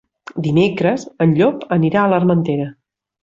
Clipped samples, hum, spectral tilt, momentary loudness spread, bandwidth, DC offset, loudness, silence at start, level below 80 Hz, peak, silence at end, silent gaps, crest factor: under 0.1%; none; -8 dB/octave; 9 LU; 7.6 kHz; under 0.1%; -16 LUFS; 0.35 s; -54 dBFS; -2 dBFS; 0.5 s; none; 14 dB